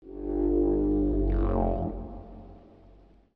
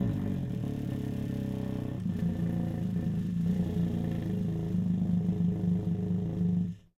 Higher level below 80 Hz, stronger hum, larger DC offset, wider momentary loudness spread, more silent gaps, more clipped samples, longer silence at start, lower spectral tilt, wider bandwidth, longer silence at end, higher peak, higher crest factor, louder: first, -34 dBFS vs -50 dBFS; neither; neither; first, 19 LU vs 5 LU; neither; neither; about the same, 0.05 s vs 0 s; first, -12.5 dB/octave vs -9.5 dB/octave; second, 3.2 kHz vs 7.4 kHz; first, 0.75 s vs 0.2 s; first, -14 dBFS vs -18 dBFS; about the same, 14 dB vs 14 dB; first, -28 LUFS vs -32 LUFS